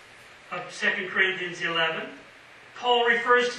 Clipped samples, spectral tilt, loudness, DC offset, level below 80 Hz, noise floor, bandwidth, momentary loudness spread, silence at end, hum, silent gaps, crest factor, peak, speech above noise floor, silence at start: under 0.1%; -2.5 dB/octave; -24 LUFS; under 0.1%; -72 dBFS; -50 dBFS; 11 kHz; 16 LU; 0 s; none; none; 20 dB; -6 dBFS; 25 dB; 0.15 s